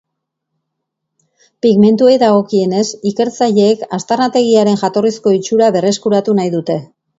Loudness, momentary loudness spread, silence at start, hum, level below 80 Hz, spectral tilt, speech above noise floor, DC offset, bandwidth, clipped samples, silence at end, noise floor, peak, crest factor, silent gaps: -13 LUFS; 8 LU; 1.65 s; none; -60 dBFS; -6 dB/octave; 63 dB; under 0.1%; 7.8 kHz; under 0.1%; 0.35 s; -75 dBFS; 0 dBFS; 12 dB; none